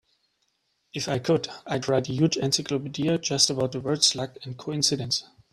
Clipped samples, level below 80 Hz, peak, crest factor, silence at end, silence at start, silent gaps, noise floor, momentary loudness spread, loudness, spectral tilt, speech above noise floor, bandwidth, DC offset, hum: under 0.1%; -62 dBFS; -4 dBFS; 22 dB; 0.3 s; 0.95 s; none; -73 dBFS; 11 LU; -25 LUFS; -3.5 dB/octave; 47 dB; 14.5 kHz; under 0.1%; none